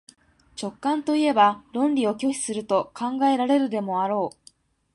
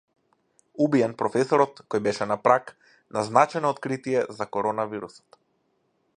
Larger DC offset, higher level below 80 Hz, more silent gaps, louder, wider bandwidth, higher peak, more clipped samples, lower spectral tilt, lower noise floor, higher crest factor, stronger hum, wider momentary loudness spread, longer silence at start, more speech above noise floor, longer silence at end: neither; about the same, -68 dBFS vs -70 dBFS; neither; about the same, -23 LUFS vs -24 LUFS; about the same, 11.5 kHz vs 10.5 kHz; about the same, -6 dBFS vs -4 dBFS; neither; second, -4.5 dB/octave vs -6 dB/octave; second, -57 dBFS vs -71 dBFS; about the same, 18 dB vs 22 dB; neither; about the same, 9 LU vs 10 LU; second, 0.55 s vs 0.8 s; second, 34 dB vs 47 dB; second, 0.65 s vs 1.1 s